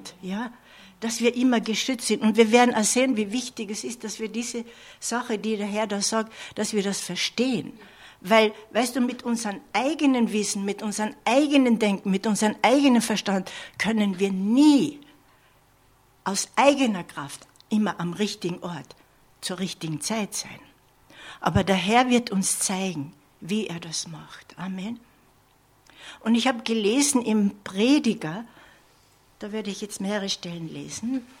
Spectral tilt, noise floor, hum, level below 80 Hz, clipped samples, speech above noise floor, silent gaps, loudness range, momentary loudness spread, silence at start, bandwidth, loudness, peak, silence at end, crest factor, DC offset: -4 dB/octave; -60 dBFS; none; -60 dBFS; under 0.1%; 36 dB; none; 8 LU; 15 LU; 0 s; 16 kHz; -24 LUFS; -2 dBFS; 0.15 s; 22 dB; under 0.1%